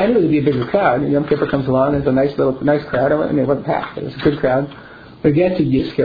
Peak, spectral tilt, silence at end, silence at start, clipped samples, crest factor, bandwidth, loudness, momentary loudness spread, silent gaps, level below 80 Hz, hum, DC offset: -2 dBFS; -10 dB/octave; 0 s; 0 s; under 0.1%; 14 dB; 5 kHz; -17 LUFS; 4 LU; none; -42 dBFS; none; under 0.1%